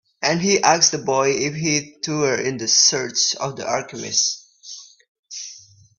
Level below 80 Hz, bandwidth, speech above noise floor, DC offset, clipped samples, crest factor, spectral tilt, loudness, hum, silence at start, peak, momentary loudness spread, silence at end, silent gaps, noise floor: -62 dBFS; 7.6 kHz; 25 dB; under 0.1%; under 0.1%; 20 dB; -2 dB/octave; -18 LUFS; none; 0.2 s; 0 dBFS; 21 LU; 0.4 s; 5.08-5.23 s; -45 dBFS